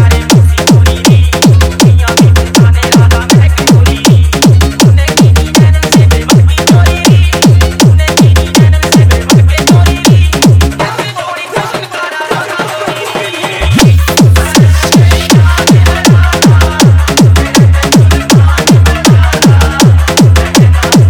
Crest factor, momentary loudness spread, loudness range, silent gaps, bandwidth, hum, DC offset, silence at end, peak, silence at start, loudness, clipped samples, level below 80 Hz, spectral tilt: 6 dB; 8 LU; 4 LU; none; over 20 kHz; none; under 0.1%; 0 s; 0 dBFS; 0 s; -6 LUFS; 10%; -16 dBFS; -5 dB/octave